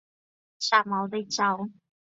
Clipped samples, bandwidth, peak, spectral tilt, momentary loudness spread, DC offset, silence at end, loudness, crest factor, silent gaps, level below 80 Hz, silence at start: under 0.1%; 8 kHz; -6 dBFS; -3 dB/octave; 10 LU; under 0.1%; 0.5 s; -26 LUFS; 22 dB; none; -78 dBFS; 0.6 s